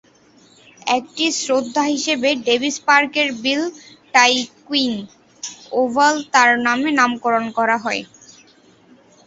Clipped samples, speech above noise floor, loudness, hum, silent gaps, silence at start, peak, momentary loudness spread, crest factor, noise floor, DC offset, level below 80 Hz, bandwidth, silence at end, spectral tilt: under 0.1%; 34 dB; -17 LUFS; none; none; 0.85 s; 0 dBFS; 10 LU; 20 dB; -51 dBFS; under 0.1%; -64 dBFS; 8 kHz; 1.2 s; -1.5 dB/octave